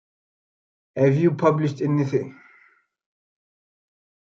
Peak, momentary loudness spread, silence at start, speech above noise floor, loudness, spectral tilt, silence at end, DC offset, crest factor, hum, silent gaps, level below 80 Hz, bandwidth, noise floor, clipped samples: -6 dBFS; 12 LU; 0.95 s; 39 dB; -21 LUFS; -9 dB/octave; 1.95 s; under 0.1%; 20 dB; none; none; -70 dBFS; 7.4 kHz; -59 dBFS; under 0.1%